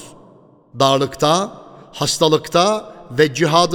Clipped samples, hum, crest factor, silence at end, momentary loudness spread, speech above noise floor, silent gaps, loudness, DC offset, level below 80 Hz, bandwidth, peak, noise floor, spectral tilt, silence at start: under 0.1%; none; 18 dB; 0 s; 10 LU; 32 dB; none; -17 LUFS; under 0.1%; -52 dBFS; 19 kHz; 0 dBFS; -48 dBFS; -4 dB/octave; 0 s